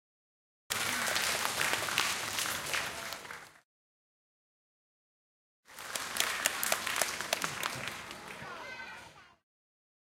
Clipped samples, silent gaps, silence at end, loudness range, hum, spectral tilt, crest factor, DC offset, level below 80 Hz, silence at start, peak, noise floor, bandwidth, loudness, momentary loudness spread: under 0.1%; 3.65-5.63 s; 0.75 s; 9 LU; none; -0.5 dB/octave; 32 dB; under 0.1%; -68 dBFS; 0.7 s; -6 dBFS; under -90 dBFS; 17 kHz; -33 LUFS; 15 LU